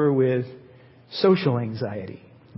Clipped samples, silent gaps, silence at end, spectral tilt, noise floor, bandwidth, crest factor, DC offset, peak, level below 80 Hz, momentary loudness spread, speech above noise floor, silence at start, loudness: under 0.1%; none; 0.4 s; -11.5 dB/octave; -50 dBFS; 5.8 kHz; 18 dB; under 0.1%; -6 dBFS; -62 dBFS; 16 LU; 28 dB; 0 s; -23 LUFS